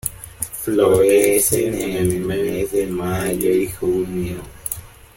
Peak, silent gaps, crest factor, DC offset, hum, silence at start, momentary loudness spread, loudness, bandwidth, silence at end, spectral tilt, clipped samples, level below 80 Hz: 0 dBFS; none; 18 dB; under 0.1%; none; 0.05 s; 14 LU; -19 LUFS; 17 kHz; 0.3 s; -5 dB/octave; under 0.1%; -42 dBFS